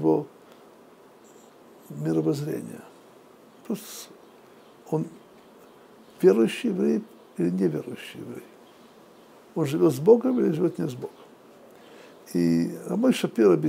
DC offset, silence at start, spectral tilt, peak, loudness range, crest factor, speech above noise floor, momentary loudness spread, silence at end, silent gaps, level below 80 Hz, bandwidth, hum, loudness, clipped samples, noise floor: under 0.1%; 0 s; -7 dB/octave; -6 dBFS; 8 LU; 22 dB; 29 dB; 21 LU; 0 s; none; -74 dBFS; 16 kHz; none; -25 LUFS; under 0.1%; -52 dBFS